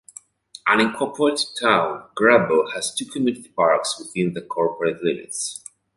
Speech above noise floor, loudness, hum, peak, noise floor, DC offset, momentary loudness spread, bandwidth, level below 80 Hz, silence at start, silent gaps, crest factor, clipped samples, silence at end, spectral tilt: 26 dB; -21 LUFS; none; -2 dBFS; -47 dBFS; under 0.1%; 10 LU; 12 kHz; -64 dBFS; 0.65 s; none; 20 dB; under 0.1%; 0.4 s; -3.5 dB/octave